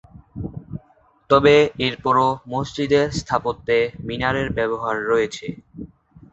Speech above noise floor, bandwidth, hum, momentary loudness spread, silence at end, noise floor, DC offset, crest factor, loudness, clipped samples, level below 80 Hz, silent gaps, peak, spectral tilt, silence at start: 37 dB; 8.2 kHz; none; 22 LU; 0.45 s; -56 dBFS; under 0.1%; 20 dB; -20 LUFS; under 0.1%; -46 dBFS; none; -2 dBFS; -5.5 dB/octave; 0.15 s